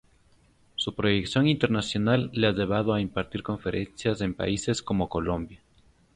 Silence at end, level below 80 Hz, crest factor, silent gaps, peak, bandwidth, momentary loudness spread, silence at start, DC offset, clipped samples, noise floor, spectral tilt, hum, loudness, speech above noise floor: 0.6 s; -48 dBFS; 20 dB; none; -8 dBFS; 11 kHz; 8 LU; 0.8 s; under 0.1%; under 0.1%; -61 dBFS; -5.5 dB/octave; none; -27 LUFS; 35 dB